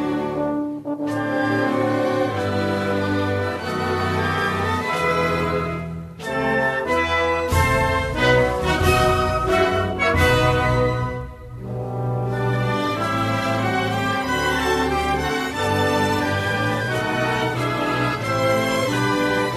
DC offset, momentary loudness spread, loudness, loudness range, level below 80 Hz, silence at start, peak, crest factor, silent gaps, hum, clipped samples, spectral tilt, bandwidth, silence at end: under 0.1%; 7 LU; -21 LUFS; 4 LU; -36 dBFS; 0 s; -4 dBFS; 18 dB; none; none; under 0.1%; -5.5 dB/octave; 13.5 kHz; 0 s